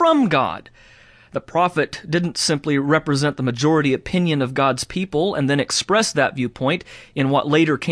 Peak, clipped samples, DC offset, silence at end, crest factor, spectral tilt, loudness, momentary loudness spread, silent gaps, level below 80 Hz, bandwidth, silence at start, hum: -2 dBFS; under 0.1%; under 0.1%; 0 s; 16 dB; -5 dB/octave; -19 LUFS; 7 LU; none; -52 dBFS; 11 kHz; 0 s; none